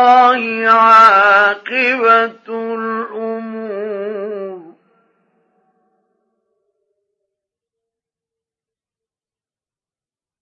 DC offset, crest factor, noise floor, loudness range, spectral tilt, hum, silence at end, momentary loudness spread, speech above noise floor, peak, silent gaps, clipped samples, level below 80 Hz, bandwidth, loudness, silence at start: under 0.1%; 16 dB; under -90 dBFS; 19 LU; -4 dB/octave; none; 5.8 s; 18 LU; over 79 dB; 0 dBFS; none; under 0.1%; -78 dBFS; 9.4 kHz; -12 LUFS; 0 s